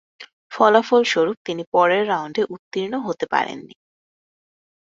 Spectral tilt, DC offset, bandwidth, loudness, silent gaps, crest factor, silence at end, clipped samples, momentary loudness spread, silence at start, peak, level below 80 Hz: -4.5 dB/octave; under 0.1%; 7.8 kHz; -20 LUFS; 0.33-0.50 s, 1.37-1.45 s, 1.67-1.72 s, 2.59-2.71 s; 20 dB; 1.2 s; under 0.1%; 12 LU; 0.2 s; -2 dBFS; -68 dBFS